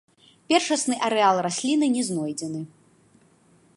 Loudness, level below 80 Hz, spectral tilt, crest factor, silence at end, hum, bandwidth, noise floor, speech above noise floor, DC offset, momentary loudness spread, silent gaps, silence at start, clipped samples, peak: -23 LUFS; -74 dBFS; -3.5 dB/octave; 22 dB; 1.1 s; none; 11.5 kHz; -59 dBFS; 36 dB; under 0.1%; 12 LU; none; 0.5 s; under 0.1%; -4 dBFS